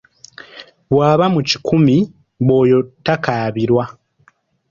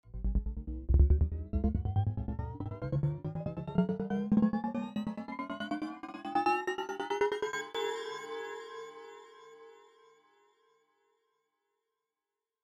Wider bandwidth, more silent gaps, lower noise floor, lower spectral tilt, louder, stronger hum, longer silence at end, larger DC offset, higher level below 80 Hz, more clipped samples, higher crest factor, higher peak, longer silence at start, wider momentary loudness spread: second, 7.4 kHz vs 8.8 kHz; neither; second, -56 dBFS vs under -90 dBFS; about the same, -7 dB/octave vs -7 dB/octave; first, -15 LUFS vs -34 LUFS; neither; second, 0.8 s vs 2.9 s; neither; second, -50 dBFS vs -38 dBFS; neither; second, 16 dB vs 22 dB; first, 0 dBFS vs -12 dBFS; first, 0.55 s vs 0.05 s; about the same, 14 LU vs 14 LU